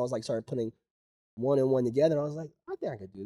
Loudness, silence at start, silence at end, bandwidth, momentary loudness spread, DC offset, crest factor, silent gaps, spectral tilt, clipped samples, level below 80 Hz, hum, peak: -30 LUFS; 0 s; 0 s; 12 kHz; 12 LU; under 0.1%; 16 dB; 0.91-1.37 s; -7.5 dB/octave; under 0.1%; -70 dBFS; none; -14 dBFS